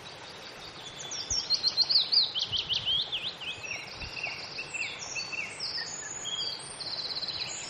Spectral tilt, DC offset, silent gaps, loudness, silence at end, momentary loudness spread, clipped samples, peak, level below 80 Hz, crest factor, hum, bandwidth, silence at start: 0 dB/octave; under 0.1%; none; -29 LUFS; 0 s; 16 LU; under 0.1%; -14 dBFS; -60 dBFS; 20 dB; none; 13.5 kHz; 0 s